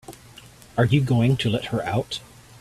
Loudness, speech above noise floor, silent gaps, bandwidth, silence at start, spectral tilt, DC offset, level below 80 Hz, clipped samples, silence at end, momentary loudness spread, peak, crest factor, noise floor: -23 LUFS; 26 dB; none; 13.5 kHz; 0.1 s; -6.5 dB/octave; under 0.1%; -50 dBFS; under 0.1%; 0.35 s; 13 LU; -6 dBFS; 18 dB; -47 dBFS